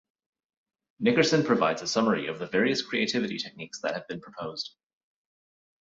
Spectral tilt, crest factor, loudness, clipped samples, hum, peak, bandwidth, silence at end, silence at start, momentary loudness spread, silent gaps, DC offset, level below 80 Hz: -4.5 dB/octave; 20 dB; -27 LUFS; under 0.1%; none; -8 dBFS; 7.8 kHz; 1.25 s; 1 s; 14 LU; none; under 0.1%; -70 dBFS